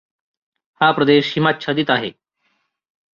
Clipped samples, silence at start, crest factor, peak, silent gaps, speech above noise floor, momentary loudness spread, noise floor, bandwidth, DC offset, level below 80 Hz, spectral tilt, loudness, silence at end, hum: under 0.1%; 0.8 s; 18 dB; -2 dBFS; none; 52 dB; 6 LU; -68 dBFS; 7.2 kHz; under 0.1%; -60 dBFS; -6.5 dB/octave; -17 LUFS; 1.05 s; none